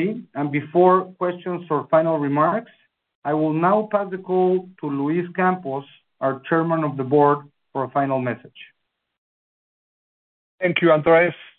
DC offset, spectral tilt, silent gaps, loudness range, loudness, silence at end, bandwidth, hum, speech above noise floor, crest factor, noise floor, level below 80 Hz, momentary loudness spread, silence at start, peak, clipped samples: under 0.1%; -11.5 dB/octave; 3.15-3.22 s, 9.18-10.58 s; 4 LU; -21 LUFS; 0.15 s; 4.2 kHz; none; over 70 dB; 18 dB; under -90 dBFS; -66 dBFS; 12 LU; 0 s; -2 dBFS; under 0.1%